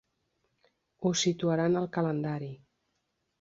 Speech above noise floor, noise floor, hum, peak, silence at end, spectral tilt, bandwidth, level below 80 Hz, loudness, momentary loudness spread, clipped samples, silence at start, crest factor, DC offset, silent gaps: 50 dB; -79 dBFS; none; -14 dBFS; 0.85 s; -5 dB/octave; 8 kHz; -70 dBFS; -30 LUFS; 9 LU; under 0.1%; 1 s; 18 dB; under 0.1%; none